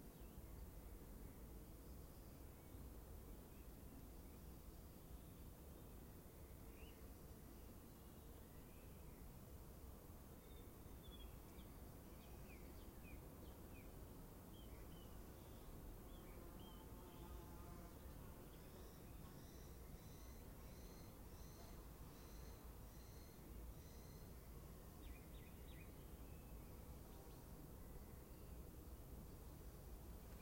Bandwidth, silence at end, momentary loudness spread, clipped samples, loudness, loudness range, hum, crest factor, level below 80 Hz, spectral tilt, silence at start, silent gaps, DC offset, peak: 16.5 kHz; 0 s; 2 LU; under 0.1%; -60 LUFS; 2 LU; none; 14 dB; -62 dBFS; -5.5 dB/octave; 0 s; none; under 0.1%; -44 dBFS